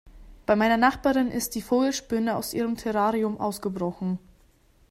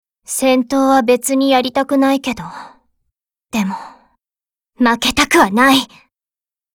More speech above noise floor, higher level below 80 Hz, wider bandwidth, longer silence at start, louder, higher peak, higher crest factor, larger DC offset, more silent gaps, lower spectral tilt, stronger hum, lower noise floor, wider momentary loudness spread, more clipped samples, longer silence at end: second, 35 dB vs over 76 dB; about the same, -52 dBFS vs -48 dBFS; second, 16 kHz vs 18.5 kHz; second, 0.05 s vs 0.3 s; second, -25 LUFS vs -14 LUFS; second, -6 dBFS vs 0 dBFS; about the same, 20 dB vs 16 dB; neither; neither; first, -5 dB/octave vs -3 dB/octave; neither; second, -59 dBFS vs under -90 dBFS; second, 9 LU vs 14 LU; neither; second, 0.75 s vs 0.9 s